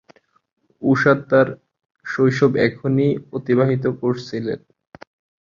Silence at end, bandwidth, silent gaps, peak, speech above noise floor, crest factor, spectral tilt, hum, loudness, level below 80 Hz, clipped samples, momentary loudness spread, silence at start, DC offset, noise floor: 0.85 s; 7.4 kHz; none; -2 dBFS; 37 dB; 18 dB; -8 dB/octave; none; -19 LUFS; -58 dBFS; under 0.1%; 12 LU; 0.8 s; under 0.1%; -55 dBFS